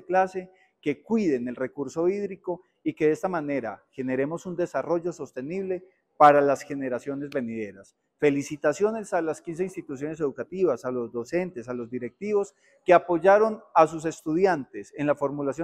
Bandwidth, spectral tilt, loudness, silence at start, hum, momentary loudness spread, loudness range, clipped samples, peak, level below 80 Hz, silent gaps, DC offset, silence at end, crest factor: 13 kHz; -6.5 dB/octave; -26 LUFS; 0.1 s; none; 14 LU; 6 LU; under 0.1%; -4 dBFS; -68 dBFS; none; under 0.1%; 0 s; 22 dB